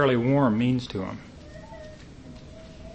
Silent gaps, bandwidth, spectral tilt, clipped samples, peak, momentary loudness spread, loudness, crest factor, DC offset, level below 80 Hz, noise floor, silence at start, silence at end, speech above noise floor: none; 8.6 kHz; -8 dB/octave; under 0.1%; -8 dBFS; 23 LU; -24 LUFS; 18 dB; under 0.1%; -50 dBFS; -44 dBFS; 0 s; 0 s; 21 dB